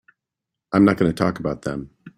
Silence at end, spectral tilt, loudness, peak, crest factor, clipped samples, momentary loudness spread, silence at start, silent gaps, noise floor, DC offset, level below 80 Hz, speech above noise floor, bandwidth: 0.1 s; -7.5 dB/octave; -20 LUFS; -2 dBFS; 18 dB; under 0.1%; 13 LU; 0.7 s; none; -84 dBFS; under 0.1%; -50 dBFS; 65 dB; 13 kHz